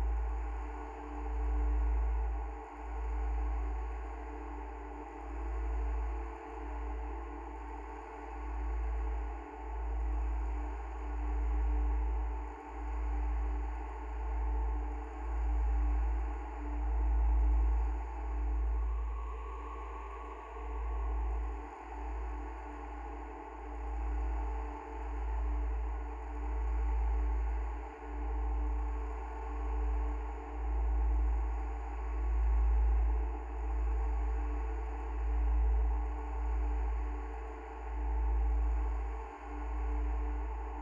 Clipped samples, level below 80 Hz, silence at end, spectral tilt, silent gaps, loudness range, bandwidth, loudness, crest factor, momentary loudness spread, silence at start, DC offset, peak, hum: under 0.1%; -34 dBFS; 0 s; -8.5 dB/octave; none; 6 LU; 3.1 kHz; -38 LUFS; 12 dB; 11 LU; 0 s; under 0.1%; -22 dBFS; none